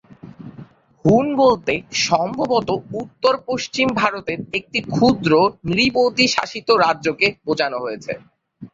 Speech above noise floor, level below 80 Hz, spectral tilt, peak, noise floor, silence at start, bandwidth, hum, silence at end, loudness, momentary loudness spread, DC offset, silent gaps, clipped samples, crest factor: 24 dB; -50 dBFS; -4.5 dB/octave; -2 dBFS; -42 dBFS; 0.25 s; 7.8 kHz; none; 0.05 s; -18 LUFS; 12 LU; under 0.1%; none; under 0.1%; 18 dB